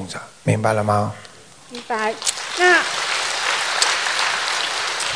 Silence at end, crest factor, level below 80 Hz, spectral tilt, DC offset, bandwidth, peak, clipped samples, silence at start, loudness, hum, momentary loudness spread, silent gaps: 0 s; 20 dB; -60 dBFS; -2.5 dB/octave; 0.2%; 11 kHz; 0 dBFS; under 0.1%; 0 s; -19 LUFS; none; 12 LU; none